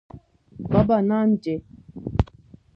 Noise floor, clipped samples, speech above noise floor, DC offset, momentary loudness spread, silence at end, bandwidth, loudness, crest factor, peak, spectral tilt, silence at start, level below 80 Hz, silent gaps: -50 dBFS; under 0.1%; 30 dB; under 0.1%; 18 LU; 0.5 s; 5.8 kHz; -23 LUFS; 20 dB; -4 dBFS; -10 dB/octave; 0.15 s; -38 dBFS; none